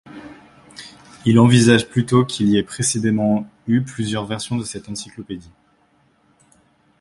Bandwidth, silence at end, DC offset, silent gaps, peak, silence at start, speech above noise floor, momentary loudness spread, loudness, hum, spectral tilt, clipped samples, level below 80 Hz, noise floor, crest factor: 11.5 kHz; 1.6 s; under 0.1%; none; 0 dBFS; 0.1 s; 42 dB; 25 LU; -18 LUFS; none; -5.5 dB/octave; under 0.1%; -52 dBFS; -59 dBFS; 20 dB